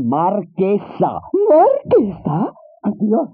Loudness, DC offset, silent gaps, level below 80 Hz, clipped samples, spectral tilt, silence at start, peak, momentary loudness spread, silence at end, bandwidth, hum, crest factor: -17 LUFS; under 0.1%; none; -54 dBFS; under 0.1%; -9 dB/octave; 0 s; -4 dBFS; 10 LU; 0.05 s; 4.5 kHz; none; 12 dB